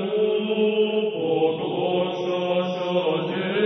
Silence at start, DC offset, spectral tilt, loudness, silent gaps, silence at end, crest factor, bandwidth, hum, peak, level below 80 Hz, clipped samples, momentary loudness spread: 0 s; under 0.1%; -7 dB/octave; -23 LUFS; none; 0 s; 12 dB; 6.2 kHz; none; -10 dBFS; -70 dBFS; under 0.1%; 3 LU